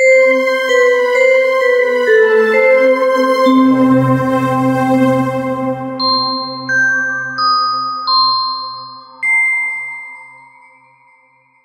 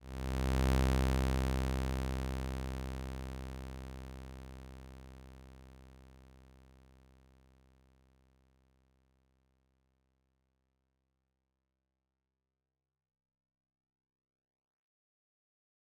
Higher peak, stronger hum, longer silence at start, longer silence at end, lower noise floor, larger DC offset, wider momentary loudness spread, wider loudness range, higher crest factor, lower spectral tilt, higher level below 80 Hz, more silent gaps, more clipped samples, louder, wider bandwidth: first, 0 dBFS vs -20 dBFS; neither; about the same, 0 s vs 0 s; second, 1.4 s vs 9.85 s; second, -51 dBFS vs under -90 dBFS; neither; second, 9 LU vs 24 LU; second, 5 LU vs 24 LU; second, 12 dB vs 20 dB; about the same, -5 dB/octave vs -6 dB/octave; second, -60 dBFS vs -42 dBFS; neither; neither; first, -12 LUFS vs -37 LUFS; second, 14.5 kHz vs 18 kHz